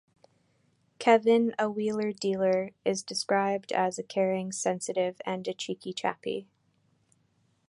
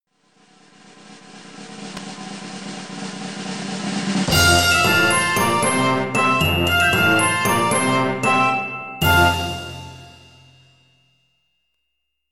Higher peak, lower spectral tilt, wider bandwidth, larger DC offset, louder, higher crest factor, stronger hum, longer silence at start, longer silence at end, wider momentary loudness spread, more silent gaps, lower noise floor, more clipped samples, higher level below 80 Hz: second, -8 dBFS vs -2 dBFS; about the same, -4.5 dB/octave vs -3.5 dB/octave; second, 11.5 kHz vs 17 kHz; neither; second, -29 LUFS vs -17 LUFS; about the same, 22 dB vs 18 dB; neither; about the same, 1 s vs 1.05 s; second, 1.25 s vs 2.1 s; second, 11 LU vs 18 LU; neither; second, -70 dBFS vs -76 dBFS; neither; second, -76 dBFS vs -42 dBFS